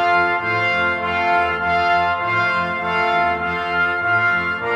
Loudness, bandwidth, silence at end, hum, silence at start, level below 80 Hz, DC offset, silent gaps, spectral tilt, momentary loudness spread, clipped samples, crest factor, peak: -18 LUFS; 9.6 kHz; 0 s; none; 0 s; -48 dBFS; under 0.1%; none; -5.5 dB/octave; 3 LU; under 0.1%; 14 dB; -6 dBFS